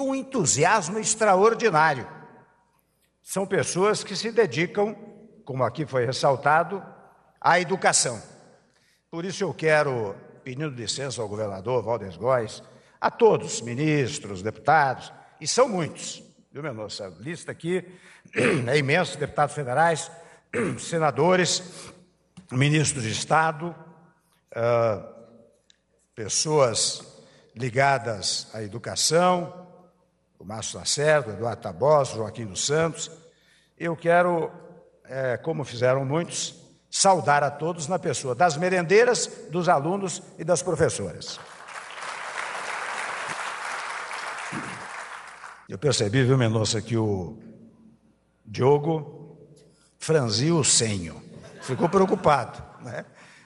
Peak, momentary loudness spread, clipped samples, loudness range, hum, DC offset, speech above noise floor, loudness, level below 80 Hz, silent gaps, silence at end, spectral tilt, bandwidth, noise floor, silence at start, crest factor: -6 dBFS; 16 LU; under 0.1%; 5 LU; none; under 0.1%; 44 dB; -24 LUFS; -62 dBFS; none; 0.4 s; -4 dB/octave; 12 kHz; -68 dBFS; 0 s; 20 dB